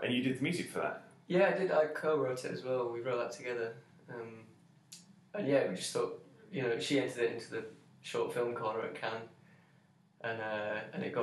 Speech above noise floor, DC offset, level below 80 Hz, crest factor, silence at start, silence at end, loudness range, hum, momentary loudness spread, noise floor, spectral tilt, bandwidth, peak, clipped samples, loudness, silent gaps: 32 dB; under 0.1%; -84 dBFS; 20 dB; 0 s; 0 s; 6 LU; none; 18 LU; -67 dBFS; -5 dB/octave; 12.5 kHz; -16 dBFS; under 0.1%; -35 LUFS; none